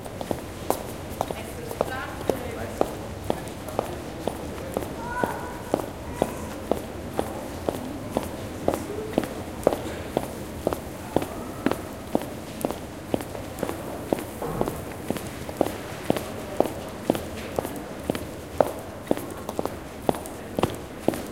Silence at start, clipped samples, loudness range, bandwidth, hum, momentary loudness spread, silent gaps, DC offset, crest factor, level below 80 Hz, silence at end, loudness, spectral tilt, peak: 0 s; under 0.1%; 2 LU; 17 kHz; none; 6 LU; none; 0.2%; 28 dB; -46 dBFS; 0 s; -30 LUFS; -5.5 dB/octave; -2 dBFS